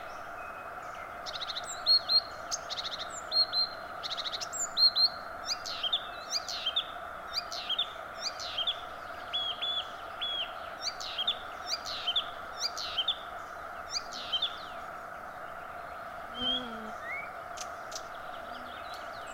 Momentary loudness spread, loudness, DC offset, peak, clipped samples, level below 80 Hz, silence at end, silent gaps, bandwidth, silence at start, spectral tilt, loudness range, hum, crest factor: 15 LU; -32 LUFS; under 0.1%; -16 dBFS; under 0.1%; -62 dBFS; 0 s; none; 16 kHz; 0 s; 0 dB/octave; 9 LU; none; 20 dB